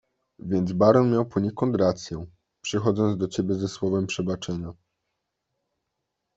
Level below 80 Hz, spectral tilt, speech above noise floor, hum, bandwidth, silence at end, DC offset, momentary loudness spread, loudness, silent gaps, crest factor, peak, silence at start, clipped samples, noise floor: -58 dBFS; -6.5 dB/octave; 57 dB; none; 8 kHz; 1.65 s; under 0.1%; 16 LU; -24 LUFS; none; 22 dB; -4 dBFS; 0.45 s; under 0.1%; -81 dBFS